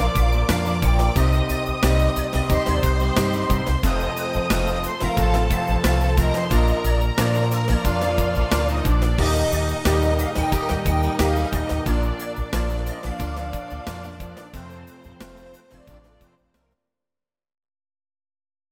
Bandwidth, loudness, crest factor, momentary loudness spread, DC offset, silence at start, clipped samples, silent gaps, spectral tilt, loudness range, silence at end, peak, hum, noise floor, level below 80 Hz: 17 kHz; -21 LUFS; 16 dB; 10 LU; under 0.1%; 0 s; under 0.1%; none; -6 dB/octave; 11 LU; 3.2 s; -4 dBFS; none; under -90 dBFS; -24 dBFS